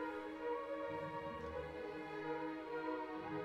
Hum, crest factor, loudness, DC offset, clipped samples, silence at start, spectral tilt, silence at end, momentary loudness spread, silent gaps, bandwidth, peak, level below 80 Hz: none; 14 dB; -45 LUFS; under 0.1%; under 0.1%; 0 s; -7 dB/octave; 0 s; 3 LU; none; 13 kHz; -30 dBFS; -66 dBFS